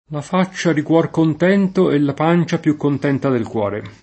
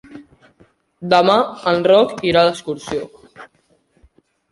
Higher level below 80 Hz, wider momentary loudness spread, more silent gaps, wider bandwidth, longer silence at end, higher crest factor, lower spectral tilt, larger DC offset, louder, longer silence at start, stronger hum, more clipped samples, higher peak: about the same, -56 dBFS vs -54 dBFS; second, 5 LU vs 14 LU; neither; second, 8.6 kHz vs 11.5 kHz; second, 0.1 s vs 1.05 s; about the same, 16 dB vs 18 dB; first, -7 dB/octave vs -5 dB/octave; neither; about the same, -17 LUFS vs -16 LUFS; about the same, 0.1 s vs 0.1 s; neither; neither; about the same, -2 dBFS vs 0 dBFS